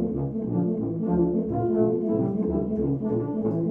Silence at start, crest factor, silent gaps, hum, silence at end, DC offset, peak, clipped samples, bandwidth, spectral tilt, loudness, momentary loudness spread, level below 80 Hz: 0 s; 14 dB; none; none; 0 s; under 0.1%; -12 dBFS; under 0.1%; 2.7 kHz; -13.5 dB/octave; -26 LUFS; 4 LU; -46 dBFS